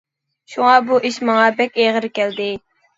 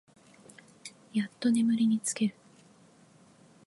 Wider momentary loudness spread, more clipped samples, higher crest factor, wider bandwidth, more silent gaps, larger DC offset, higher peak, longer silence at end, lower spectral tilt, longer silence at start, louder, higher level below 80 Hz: second, 11 LU vs 22 LU; neither; about the same, 18 dB vs 16 dB; second, 7.8 kHz vs 11.5 kHz; neither; neither; first, 0 dBFS vs -16 dBFS; second, 0.4 s vs 1.35 s; about the same, -4 dB/octave vs -4.5 dB/octave; second, 0.5 s vs 0.85 s; first, -16 LUFS vs -29 LUFS; first, -64 dBFS vs -80 dBFS